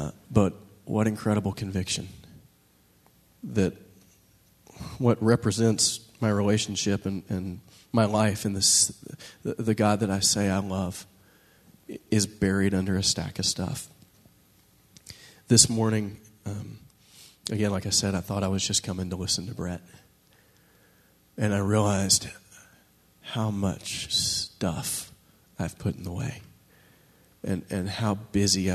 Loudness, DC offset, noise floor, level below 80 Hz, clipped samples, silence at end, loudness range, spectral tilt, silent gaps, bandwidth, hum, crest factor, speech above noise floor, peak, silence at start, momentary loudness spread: -26 LUFS; under 0.1%; -62 dBFS; -54 dBFS; under 0.1%; 0 s; 6 LU; -4 dB/octave; none; 13.5 kHz; none; 24 dB; 36 dB; -4 dBFS; 0 s; 19 LU